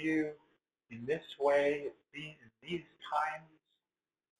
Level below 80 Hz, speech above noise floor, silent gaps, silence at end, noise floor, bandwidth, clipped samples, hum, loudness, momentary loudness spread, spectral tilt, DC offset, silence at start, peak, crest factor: -76 dBFS; over 54 dB; none; 0.95 s; under -90 dBFS; 11.5 kHz; under 0.1%; none; -35 LUFS; 17 LU; -6 dB/octave; under 0.1%; 0 s; -18 dBFS; 18 dB